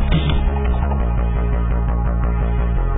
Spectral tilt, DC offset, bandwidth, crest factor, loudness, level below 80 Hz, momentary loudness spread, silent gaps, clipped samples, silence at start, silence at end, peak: -12.5 dB/octave; under 0.1%; 3.9 kHz; 12 dB; -20 LUFS; -18 dBFS; 2 LU; none; under 0.1%; 0 s; 0 s; -4 dBFS